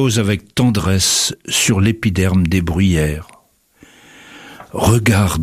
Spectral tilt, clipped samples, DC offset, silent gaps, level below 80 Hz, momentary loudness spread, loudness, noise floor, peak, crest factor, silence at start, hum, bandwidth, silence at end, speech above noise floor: -4.5 dB/octave; under 0.1%; under 0.1%; none; -34 dBFS; 6 LU; -15 LUFS; -50 dBFS; 0 dBFS; 16 dB; 0 s; none; 15.5 kHz; 0 s; 36 dB